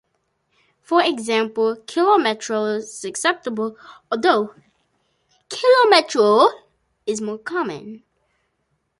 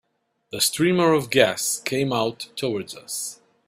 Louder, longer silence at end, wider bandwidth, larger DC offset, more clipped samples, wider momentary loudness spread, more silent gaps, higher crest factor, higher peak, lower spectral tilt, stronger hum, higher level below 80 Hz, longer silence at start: first, -19 LUFS vs -22 LUFS; first, 1.05 s vs 0.35 s; second, 11.5 kHz vs 16 kHz; neither; neither; about the same, 14 LU vs 12 LU; neither; about the same, 18 dB vs 22 dB; about the same, -2 dBFS vs 0 dBFS; about the same, -3 dB/octave vs -3.5 dB/octave; neither; second, -72 dBFS vs -64 dBFS; first, 0.9 s vs 0.55 s